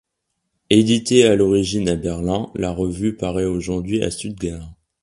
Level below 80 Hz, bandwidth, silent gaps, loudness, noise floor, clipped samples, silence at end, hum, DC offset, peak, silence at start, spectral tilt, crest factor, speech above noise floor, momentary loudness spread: -40 dBFS; 11.5 kHz; none; -19 LUFS; -75 dBFS; under 0.1%; 0.3 s; none; under 0.1%; 0 dBFS; 0.7 s; -5.5 dB/octave; 20 dB; 57 dB; 12 LU